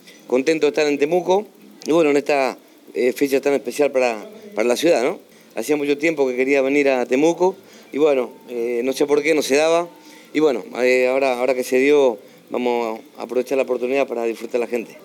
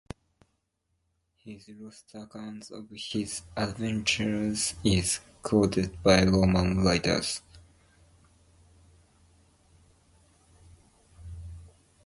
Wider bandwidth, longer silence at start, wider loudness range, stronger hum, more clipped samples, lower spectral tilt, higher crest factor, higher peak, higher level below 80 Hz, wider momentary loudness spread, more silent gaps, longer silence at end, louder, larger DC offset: first, 18 kHz vs 11.5 kHz; second, 0.3 s vs 1.45 s; second, 2 LU vs 15 LU; neither; neither; about the same, -4 dB/octave vs -4.5 dB/octave; second, 14 dB vs 24 dB; about the same, -6 dBFS vs -8 dBFS; second, -84 dBFS vs -46 dBFS; second, 12 LU vs 24 LU; neither; second, 0.05 s vs 0.35 s; first, -19 LUFS vs -27 LUFS; neither